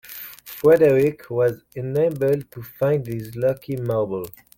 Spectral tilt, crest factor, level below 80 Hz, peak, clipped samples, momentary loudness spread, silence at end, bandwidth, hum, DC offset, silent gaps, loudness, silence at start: -7.5 dB/octave; 16 dB; -56 dBFS; -4 dBFS; under 0.1%; 16 LU; 0.3 s; 17 kHz; none; under 0.1%; none; -21 LUFS; 0.1 s